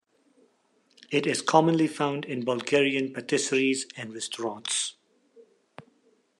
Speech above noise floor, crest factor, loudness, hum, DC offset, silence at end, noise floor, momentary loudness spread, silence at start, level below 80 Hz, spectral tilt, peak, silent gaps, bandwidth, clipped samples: 41 dB; 24 dB; -26 LUFS; none; under 0.1%; 0.6 s; -67 dBFS; 11 LU; 1.1 s; -78 dBFS; -3.5 dB/octave; -4 dBFS; none; 12 kHz; under 0.1%